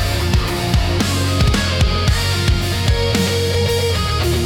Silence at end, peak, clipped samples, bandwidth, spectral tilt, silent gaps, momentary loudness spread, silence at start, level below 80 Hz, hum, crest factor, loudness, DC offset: 0 s; -4 dBFS; under 0.1%; 17.5 kHz; -4.5 dB/octave; none; 2 LU; 0 s; -22 dBFS; none; 12 dB; -17 LUFS; under 0.1%